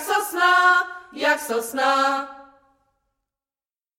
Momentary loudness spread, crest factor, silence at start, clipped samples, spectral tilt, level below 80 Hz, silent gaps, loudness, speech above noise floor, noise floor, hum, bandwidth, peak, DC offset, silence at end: 12 LU; 18 dB; 0 s; under 0.1%; -0.5 dB/octave; -70 dBFS; none; -20 LUFS; over 68 dB; under -90 dBFS; none; 16.5 kHz; -6 dBFS; under 0.1%; 1.55 s